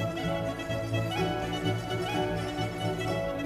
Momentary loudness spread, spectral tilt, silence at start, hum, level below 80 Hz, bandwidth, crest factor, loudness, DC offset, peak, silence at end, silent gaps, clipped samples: 3 LU; -6 dB/octave; 0 s; none; -48 dBFS; 14 kHz; 14 dB; -31 LUFS; under 0.1%; -16 dBFS; 0 s; none; under 0.1%